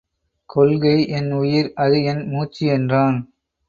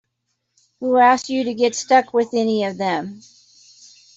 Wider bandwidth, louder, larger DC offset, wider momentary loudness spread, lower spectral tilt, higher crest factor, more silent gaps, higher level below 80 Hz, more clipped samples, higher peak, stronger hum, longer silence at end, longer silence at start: second, 7 kHz vs 8 kHz; about the same, -19 LUFS vs -18 LUFS; neither; about the same, 8 LU vs 10 LU; first, -8.5 dB/octave vs -4 dB/octave; about the same, 16 dB vs 16 dB; neither; first, -54 dBFS vs -68 dBFS; neither; about the same, -4 dBFS vs -4 dBFS; neither; second, 0.45 s vs 1 s; second, 0.55 s vs 0.8 s